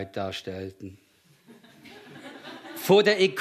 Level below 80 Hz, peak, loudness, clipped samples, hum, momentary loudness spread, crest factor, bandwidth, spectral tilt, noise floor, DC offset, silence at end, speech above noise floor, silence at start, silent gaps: -72 dBFS; -8 dBFS; -24 LUFS; under 0.1%; none; 25 LU; 20 dB; 14 kHz; -4.5 dB/octave; -56 dBFS; under 0.1%; 0 s; 32 dB; 0 s; none